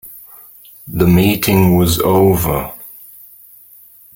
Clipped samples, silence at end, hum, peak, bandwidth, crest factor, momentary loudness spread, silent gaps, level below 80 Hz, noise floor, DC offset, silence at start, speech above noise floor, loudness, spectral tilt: under 0.1%; 1.25 s; none; 0 dBFS; 17 kHz; 14 dB; 22 LU; none; -36 dBFS; -43 dBFS; under 0.1%; 0.05 s; 31 dB; -13 LUFS; -6 dB/octave